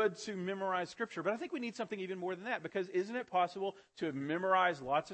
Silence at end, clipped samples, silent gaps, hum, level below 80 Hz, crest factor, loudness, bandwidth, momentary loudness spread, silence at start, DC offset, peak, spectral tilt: 0 s; under 0.1%; none; none; -78 dBFS; 18 dB; -37 LUFS; 8.4 kHz; 9 LU; 0 s; under 0.1%; -18 dBFS; -5 dB/octave